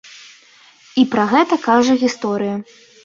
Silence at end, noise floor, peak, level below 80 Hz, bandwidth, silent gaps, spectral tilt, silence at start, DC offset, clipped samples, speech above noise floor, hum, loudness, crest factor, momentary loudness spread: 0.4 s; -48 dBFS; -2 dBFS; -60 dBFS; 7.6 kHz; none; -5 dB/octave; 0.95 s; under 0.1%; under 0.1%; 32 dB; none; -16 LUFS; 16 dB; 10 LU